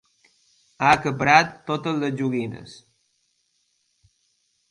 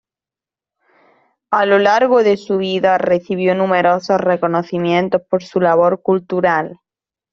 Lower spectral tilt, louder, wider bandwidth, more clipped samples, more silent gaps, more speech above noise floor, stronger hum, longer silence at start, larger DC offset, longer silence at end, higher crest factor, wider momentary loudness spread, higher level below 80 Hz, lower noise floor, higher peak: second, -5 dB/octave vs -6.5 dB/octave; second, -21 LUFS vs -15 LUFS; first, 11.5 kHz vs 7.2 kHz; neither; neither; second, 48 dB vs 75 dB; neither; second, 0.8 s vs 1.5 s; neither; first, 2 s vs 0.6 s; first, 24 dB vs 14 dB; first, 16 LU vs 6 LU; about the same, -60 dBFS vs -60 dBFS; second, -70 dBFS vs -89 dBFS; about the same, 0 dBFS vs -2 dBFS